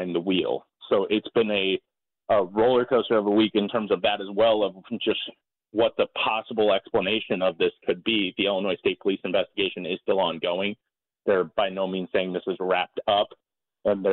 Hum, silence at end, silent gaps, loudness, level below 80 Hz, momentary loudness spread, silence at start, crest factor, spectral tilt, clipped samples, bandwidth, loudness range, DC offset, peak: none; 0 s; none; -25 LUFS; -64 dBFS; 8 LU; 0 s; 16 dB; -9.5 dB/octave; under 0.1%; 4.3 kHz; 3 LU; under 0.1%; -10 dBFS